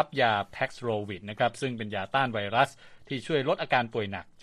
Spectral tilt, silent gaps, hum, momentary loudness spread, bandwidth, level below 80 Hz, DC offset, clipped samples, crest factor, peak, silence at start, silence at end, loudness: -5.5 dB/octave; none; none; 8 LU; 13 kHz; -64 dBFS; under 0.1%; under 0.1%; 22 dB; -8 dBFS; 0 s; 0 s; -29 LUFS